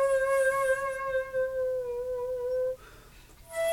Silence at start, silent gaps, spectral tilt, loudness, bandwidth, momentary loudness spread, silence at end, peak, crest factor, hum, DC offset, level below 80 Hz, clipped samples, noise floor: 0 s; none; -2 dB/octave; -30 LUFS; 17.5 kHz; 8 LU; 0 s; -16 dBFS; 14 dB; none; under 0.1%; -56 dBFS; under 0.1%; -52 dBFS